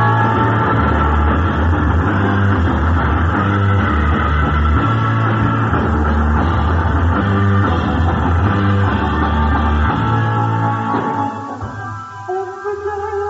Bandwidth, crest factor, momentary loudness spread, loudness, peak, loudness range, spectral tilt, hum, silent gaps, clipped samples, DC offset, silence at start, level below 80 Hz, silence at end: 7.4 kHz; 12 dB; 8 LU; -16 LUFS; -2 dBFS; 3 LU; -6.5 dB/octave; none; none; under 0.1%; under 0.1%; 0 s; -22 dBFS; 0 s